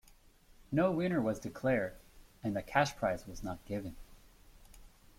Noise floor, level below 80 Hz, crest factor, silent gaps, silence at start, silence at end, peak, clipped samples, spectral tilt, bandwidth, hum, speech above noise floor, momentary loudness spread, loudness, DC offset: -62 dBFS; -56 dBFS; 22 dB; none; 0.6 s; 0.3 s; -14 dBFS; under 0.1%; -6 dB/octave; 16.5 kHz; none; 28 dB; 11 LU; -35 LUFS; under 0.1%